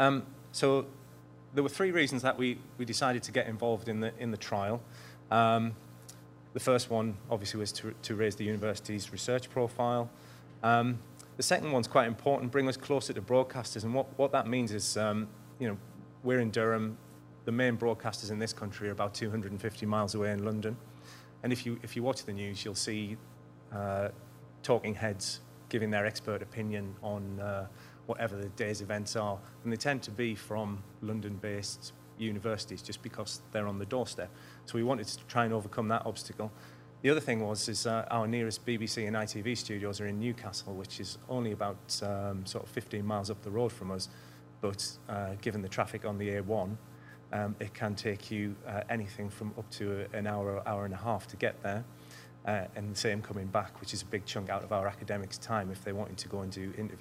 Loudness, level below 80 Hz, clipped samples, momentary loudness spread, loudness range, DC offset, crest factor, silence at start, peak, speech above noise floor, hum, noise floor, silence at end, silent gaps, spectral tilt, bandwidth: -34 LUFS; -70 dBFS; under 0.1%; 12 LU; 6 LU; under 0.1%; 24 dB; 0 s; -10 dBFS; 20 dB; none; -53 dBFS; 0 s; none; -5 dB/octave; 16 kHz